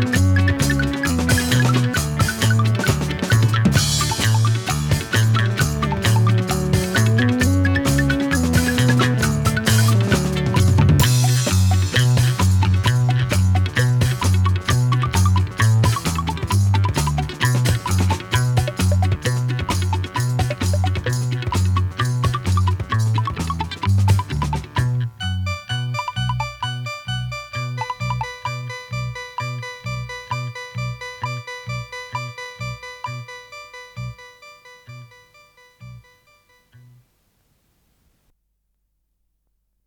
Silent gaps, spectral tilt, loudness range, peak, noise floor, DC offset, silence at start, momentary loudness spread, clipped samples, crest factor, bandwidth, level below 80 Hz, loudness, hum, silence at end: none; -5 dB/octave; 13 LU; -2 dBFS; -70 dBFS; under 0.1%; 0 s; 12 LU; under 0.1%; 18 dB; 18.5 kHz; -36 dBFS; -19 LUFS; none; 3.85 s